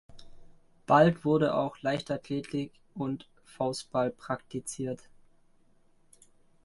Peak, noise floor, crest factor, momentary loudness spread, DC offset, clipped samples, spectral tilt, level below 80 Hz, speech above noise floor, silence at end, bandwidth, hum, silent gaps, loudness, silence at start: -10 dBFS; -63 dBFS; 22 dB; 15 LU; under 0.1%; under 0.1%; -6 dB/octave; -62 dBFS; 34 dB; 1.7 s; 11.5 kHz; none; none; -30 LUFS; 0.15 s